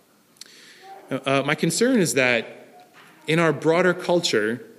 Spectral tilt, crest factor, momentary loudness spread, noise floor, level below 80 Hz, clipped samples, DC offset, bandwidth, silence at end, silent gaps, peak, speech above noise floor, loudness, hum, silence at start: -4.5 dB/octave; 18 dB; 9 LU; -49 dBFS; -70 dBFS; under 0.1%; under 0.1%; 15.5 kHz; 0.15 s; none; -4 dBFS; 28 dB; -21 LUFS; none; 0.85 s